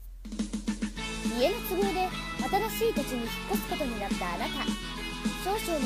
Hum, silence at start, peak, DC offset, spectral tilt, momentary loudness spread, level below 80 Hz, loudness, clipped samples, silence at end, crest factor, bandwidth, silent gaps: none; 0 s; -14 dBFS; under 0.1%; -4 dB/octave; 6 LU; -42 dBFS; -31 LUFS; under 0.1%; 0 s; 18 dB; 15.5 kHz; none